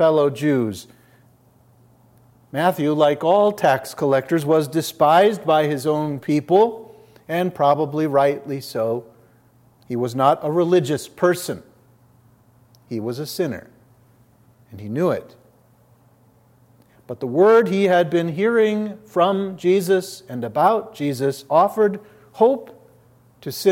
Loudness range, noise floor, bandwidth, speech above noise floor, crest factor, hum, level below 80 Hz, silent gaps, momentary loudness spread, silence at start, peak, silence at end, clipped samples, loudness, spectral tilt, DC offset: 11 LU; -55 dBFS; 16.5 kHz; 36 dB; 18 dB; none; -68 dBFS; none; 13 LU; 0 s; -4 dBFS; 0 s; under 0.1%; -19 LUFS; -6 dB/octave; under 0.1%